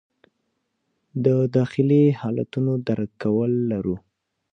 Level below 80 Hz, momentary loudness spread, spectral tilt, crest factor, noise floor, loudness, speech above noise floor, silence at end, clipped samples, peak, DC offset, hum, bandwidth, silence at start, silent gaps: -58 dBFS; 9 LU; -10 dB/octave; 16 dB; -74 dBFS; -22 LUFS; 54 dB; 0.55 s; under 0.1%; -6 dBFS; under 0.1%; none; 6.4 kHz; 1.15 s; none